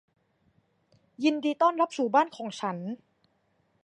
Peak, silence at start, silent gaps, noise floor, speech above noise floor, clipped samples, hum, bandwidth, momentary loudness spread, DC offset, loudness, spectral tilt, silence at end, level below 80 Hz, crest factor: -10 dBFS; 1.2 s; none; -71 dBFS; 44 dB; under 0.1%; none; 10 kHz; 12 LU; under 0.1%; -27 LUFS; -5 dB/octave; 0.9 s; -82 dBFS; 20 dB